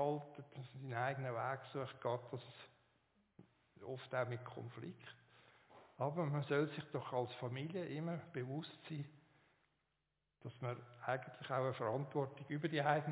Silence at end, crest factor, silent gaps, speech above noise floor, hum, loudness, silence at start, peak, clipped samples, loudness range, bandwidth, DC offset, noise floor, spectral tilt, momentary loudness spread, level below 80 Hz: 0 s; 22 dB; none; 45 dB; none; -43 LUFS; 0 s; -22 dBFS; under 0.1%; 7 LU; 4 kHz; under 0.1%; -88 dBFS; -5.5 dB/octave; 16 LU; -84 dBFS